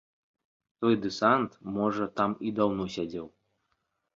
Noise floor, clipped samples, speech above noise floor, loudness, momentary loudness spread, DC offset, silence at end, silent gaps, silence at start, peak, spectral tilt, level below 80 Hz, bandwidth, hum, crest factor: -78 dBFS; under 0.1%; 50 dB; -29 LUFS; 11 LU; under 0.1%; 0.85 s; none; 0.8 s; -10 dBFS; -6.5 dB/octave; -64 dBFS; 7.6 kHz; none; 22 dB